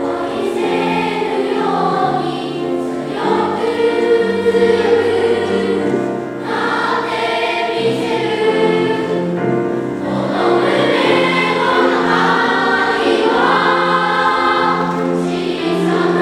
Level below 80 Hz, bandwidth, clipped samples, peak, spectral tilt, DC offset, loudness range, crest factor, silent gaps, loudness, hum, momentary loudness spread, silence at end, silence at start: -52 dBFS; 12.5 kHz; under 0.1%; 0 dBFS; -5.5 dB/octave; under 0.1%; 4 LU; 14 dB; none; -15 LUFS; none; 6 LU; 0 s; 0 s